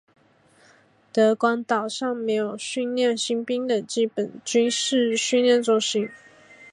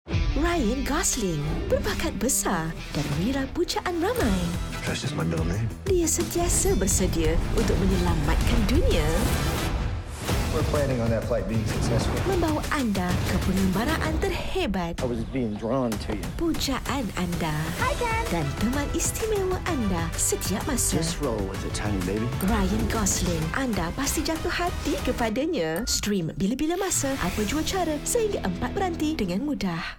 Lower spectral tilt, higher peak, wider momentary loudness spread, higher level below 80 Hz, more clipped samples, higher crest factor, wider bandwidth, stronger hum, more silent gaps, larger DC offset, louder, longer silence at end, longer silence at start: second, -3 dB/octave vs -4.5 dB/octave; about the same, -8 dBFS vs -10 dBFS; first, 8 LU vs 5 LU; second, -78 dBFS vs -32 dBFS; neither; about the same, 16 dB vs 14 dB; second, 11 kHz vs 17 kHz; neither; neither; neither; first, -23 LUFS vs -26 LUFS; about the same, 0.05 s vs 0 s; first, 1.15 s vs 0.05 s